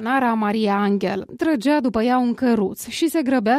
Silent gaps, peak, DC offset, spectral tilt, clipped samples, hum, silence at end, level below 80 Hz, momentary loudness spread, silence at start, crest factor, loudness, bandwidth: none; -8 dBFS; under 0.1%; -5.5 dB/octave; under 0.1%; none; 0 s; -54 dBFS; 4 LU; 0 s; 12 dB; -20 LUFS; 15.5 kHz